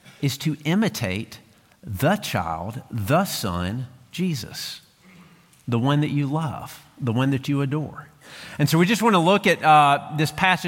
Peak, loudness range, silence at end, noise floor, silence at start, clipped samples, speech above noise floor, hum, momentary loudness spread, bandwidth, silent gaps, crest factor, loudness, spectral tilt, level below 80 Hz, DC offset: -4 dBFS; 7 LU; 0 s; -51 dBFS; 0.1 s; under 0.1%; 29 dB; none; 18 LU; 17 kHz; none; 18 dB; -22 LUFS; -5.5 dB/octave; -54 dBFS; under 0.1%